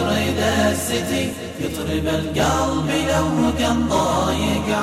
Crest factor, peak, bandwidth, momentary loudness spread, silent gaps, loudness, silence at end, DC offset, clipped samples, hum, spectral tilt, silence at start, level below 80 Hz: 12 dB; -6 dBFS; 16 kHz; 5 LU; none; -20 LUFS; 0 s; under 0.1%; under 0.1%; none; -4.5 dB/octave; 0 s; -34 dBFS